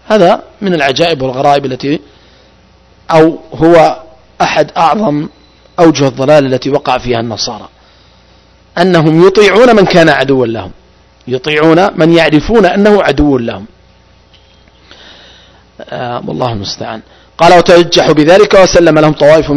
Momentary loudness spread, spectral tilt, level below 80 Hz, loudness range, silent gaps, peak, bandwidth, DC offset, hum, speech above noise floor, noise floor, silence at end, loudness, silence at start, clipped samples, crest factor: 14 LU; -5.5 dB/octave; -34 dBFS; 7 LU; none; 0 dBFS; 11 kHz; under 0.1%; none; 36 dB; -43 dBFS; 0 s; -8 LUFS; 0.1 s; 5%; 8 dB